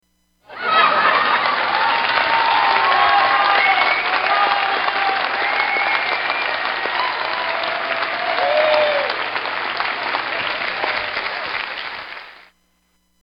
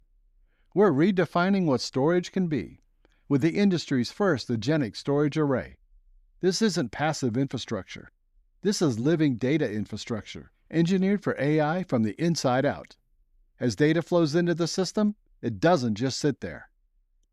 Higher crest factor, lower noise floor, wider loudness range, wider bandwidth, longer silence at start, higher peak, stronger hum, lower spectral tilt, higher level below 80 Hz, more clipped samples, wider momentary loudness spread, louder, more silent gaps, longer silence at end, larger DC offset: about the same, 18 dB vs 16 dB; second, -63 dBFS vs -67 dBFS; first, 7 LU vs 3 LU; second, 6 kHz vs 13 kHz; second, 0.5 s vs 0.75 s; first, -2 dBFS vs -10 dBFS; neither; second, -4 dB/octave vs -6 dB/octave; about the same, -60 dBFS vs -60 dBFS; neither; about the same, 9 LU vs 11 LU; first, -17 LUFS vs -26 LUFS; neither; first, 0.9 s vs 0.7 s; neither